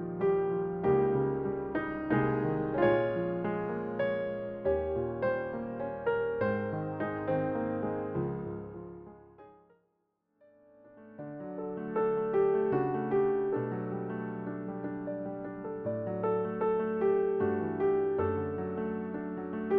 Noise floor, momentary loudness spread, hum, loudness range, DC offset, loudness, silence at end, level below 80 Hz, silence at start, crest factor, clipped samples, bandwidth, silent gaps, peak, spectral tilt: -78 dBFS; 10 LU; none; 9 LU; under 0.1%; -32 LUFS; 0 s; -58 dBFS; 0 s; 18 dB; under 0.1%; 4.2 kHz; none; -14 dBFS; -7.5 dB/octave